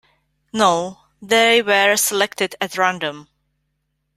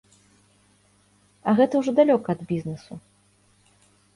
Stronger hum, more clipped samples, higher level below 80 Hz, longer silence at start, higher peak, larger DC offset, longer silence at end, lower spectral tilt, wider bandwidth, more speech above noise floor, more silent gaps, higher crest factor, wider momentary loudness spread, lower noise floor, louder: second, none vs 50 Hz at -55 dBFS; neither; about the same, -64 dBFS vs -64 dBFS; second, 0.55 s vs 1.45 s; first, 0 dBFS vs -6 dBFS; neither; second, 0.95 s vs 1.15 s; second, -2 dB/octave vs -7.5 dB/octave; first, 16 kHz vs 11.5 kHz; first, 54 dB vs 40 dB; neither; about the same, 20 dB vs 20 dB; second, 13 LU vs 20 LU; first, -72 dBFS vs -61 dBFS; first, -17 LUFS vs -22 LUFS